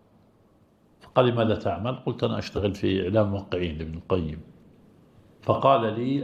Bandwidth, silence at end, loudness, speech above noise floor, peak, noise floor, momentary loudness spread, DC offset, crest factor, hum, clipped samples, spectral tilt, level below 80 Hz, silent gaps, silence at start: 8.2 kHz; 0 s; -26 LUFS; 35 dB; -6 dBFS; -60 dBFS; 10 LU; under 0.1%; 22 dB; none; under 0.1%; -8 dB/octave; -52 dBFS; none; 1.05 s